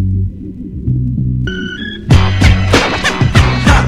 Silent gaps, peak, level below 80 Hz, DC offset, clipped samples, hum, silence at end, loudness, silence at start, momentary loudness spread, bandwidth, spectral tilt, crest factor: none; 0 dBFS; -18 dBFS; under 0.1%; 0.4%; none; 0 s; -13 LUFS; 0 s; 12 LU; 13 kHz; -5.5 dB/octave; 12 dB